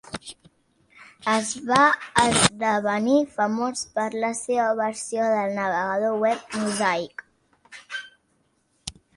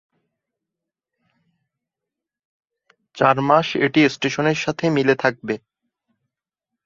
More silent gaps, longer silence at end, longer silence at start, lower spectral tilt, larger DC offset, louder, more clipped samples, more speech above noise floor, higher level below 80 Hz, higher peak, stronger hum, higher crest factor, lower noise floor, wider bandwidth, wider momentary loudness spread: neither; second, 0.25 s vs 1.3 s; second, 0.05 s vs 3.15 s; second, -3 dB/octave vs -5.5 dB/octave; neither; second, -23 LUFS vs -19 LUFS; neither; second, 45 dB vs 67 dB; about the same, -58 dBFS vs -62 dBFS; about the same, 0 dBFS vs -2 dBFS; neither; about the same, 24 dB vs 20 dB; second, -68 dBFS vs -85 dBFS; first, 11.5 kHz vs 7.6 kHz; first, 18 LU vs 8 LU